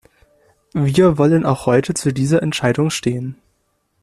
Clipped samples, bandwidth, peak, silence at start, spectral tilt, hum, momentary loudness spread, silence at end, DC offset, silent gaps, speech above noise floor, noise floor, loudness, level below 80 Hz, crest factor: under 0.1%; 13.5 kHz; -2 dBFS; 0.75 s; -6 dB/octave; none; 10 LU; 0.7 s; under 0.1%; none; 50 dB; -66 dBFS; -17 LUFS; -48 dBFS; 16 dB